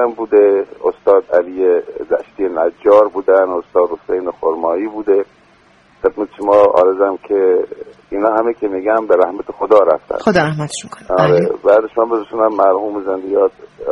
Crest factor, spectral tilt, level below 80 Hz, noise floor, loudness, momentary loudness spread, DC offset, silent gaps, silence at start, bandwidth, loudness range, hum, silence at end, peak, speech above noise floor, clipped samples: 14 dB; -6.5 dB/octave; -52 dBFS; -49 dBFS; -14 LUFS; 9 LU; under 0.1%; none; 0 s; 11 kHz; 2 LU; none; 0 s; 0 dBFS; 35 dB; under 0.1%